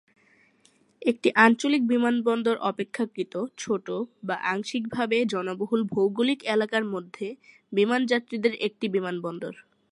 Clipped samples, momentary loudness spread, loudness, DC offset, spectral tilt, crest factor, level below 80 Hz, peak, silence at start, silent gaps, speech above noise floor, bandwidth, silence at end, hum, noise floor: under 0.1%; 10 LU; -26 LUFS; under 0.1%; -5 dB/octave; 24 dB; -74 dBFS; -2 dBFS; 1 s; none; 37 dB; 11 kHz; 0.3 s; none; -63 dBFS